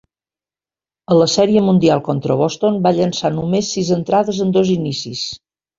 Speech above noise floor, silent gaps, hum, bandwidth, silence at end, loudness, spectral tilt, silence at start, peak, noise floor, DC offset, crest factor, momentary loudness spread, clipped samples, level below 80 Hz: over 75 dB; none; none; 7.6 kHz; 0.4 s; -16 LUFS; -6 dB/octave; 1.1 s; -2 dBFS; under -90 dBFS; under 0.1%; 16 dB; 10 LU; under 0.1%; -52 dBFS